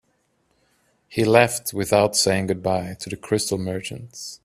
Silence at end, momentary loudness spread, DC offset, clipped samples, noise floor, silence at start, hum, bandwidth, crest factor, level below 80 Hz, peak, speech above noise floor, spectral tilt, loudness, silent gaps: 0.1 s; 16 LU; under 0.1%; under 0.1%; -67 dBFS; 1.1 s; none; 15.5 kHz; 22 dB; -56 dBFS; 0 dBFS; 46 dB; -4 dB/octave; -21 LUFS; none